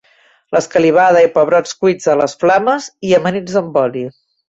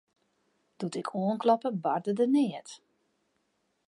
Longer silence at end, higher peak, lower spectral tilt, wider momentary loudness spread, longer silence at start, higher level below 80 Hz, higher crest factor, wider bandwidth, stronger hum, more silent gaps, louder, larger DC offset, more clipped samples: second, 0.4 s vs 1.1 s; first, -2 dBFS vs -12 dBFS; second, -5 dB/octave vs -7 dB/octave; second, 9 LU vs 13 LU; second, 0.5 s vs 0.8 s; first, -56 dBFS vs -84 dBFS; second, 12 dB vs 20 dB; second, 8 kHz vs 11.5 kHz; neither; neither; first, -13 LUFS vs -29 LUFS; neither; neither